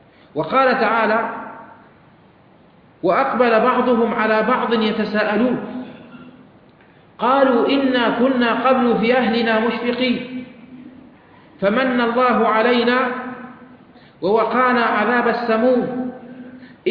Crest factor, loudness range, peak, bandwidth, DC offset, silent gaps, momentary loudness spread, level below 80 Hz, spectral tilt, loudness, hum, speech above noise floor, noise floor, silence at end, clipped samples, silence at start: 16 dB; 3 LU; -2 dBFS; 5.2 kHz; under 0.1%; none; 16 LU; -58 dBFS; -8 dB/octave; -17 LUFS; none; 33 dB; -50 dBFS; 0 s; under 0.1%; 0.35 s